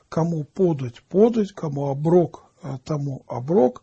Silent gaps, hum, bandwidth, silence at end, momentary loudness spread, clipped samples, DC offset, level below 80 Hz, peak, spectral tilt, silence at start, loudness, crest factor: none; none; 8 kHz; 0.1 s; 12 LU; under 0.1%; under 0.1%; -58 dBFS; -4 dBFS; -9 dB/octave; 0.1 s; -22 LUFS; 18 dB